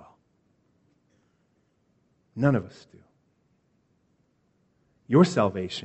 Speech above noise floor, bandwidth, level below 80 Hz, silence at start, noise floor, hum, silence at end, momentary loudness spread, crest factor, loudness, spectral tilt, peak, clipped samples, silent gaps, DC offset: 46 dB; 8.2 kHz; -66 dBFS; 2.35 s; -70 dBFS; none; 0.05 s; 19 LU; 24 dB; -24 LUFS; -7 dB/octave; -6 dBFS; under 0.1%; none; under 0.1%